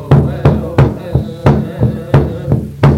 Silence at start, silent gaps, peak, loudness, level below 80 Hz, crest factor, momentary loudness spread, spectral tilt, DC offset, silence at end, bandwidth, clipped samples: 0 s; none; 0 dBFS; -13 LUFS; -24 dBFS; 12 dB; 5 LU; -9 dB/octave; under 0.1%; 0 s; 6.4 kHz; under 0.1%